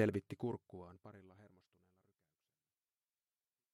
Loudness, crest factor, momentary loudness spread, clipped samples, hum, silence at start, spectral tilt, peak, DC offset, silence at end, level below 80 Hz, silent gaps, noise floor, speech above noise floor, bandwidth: -44 LUFS; 24 dB; 20 LU; under 0.1%; none; 0 s; -8 dB/octave; -22 dBFS; under 0.1%; 2.25 s; -80 dBFS; none; under -90 dBFS; over 48 dB; 13 kHz